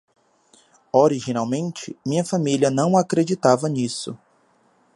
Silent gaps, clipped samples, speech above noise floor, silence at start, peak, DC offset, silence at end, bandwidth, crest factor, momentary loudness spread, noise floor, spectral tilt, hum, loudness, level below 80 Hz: none; under 0.1%; 40 dB; 0.95 s; -2 dBFS; under 0.1%; 0.8 s; 11.5 kHz; 20 dB; 12 LU; -60 dBFS; -6 dB/octave; none; -21 LUFS; -66 dBFS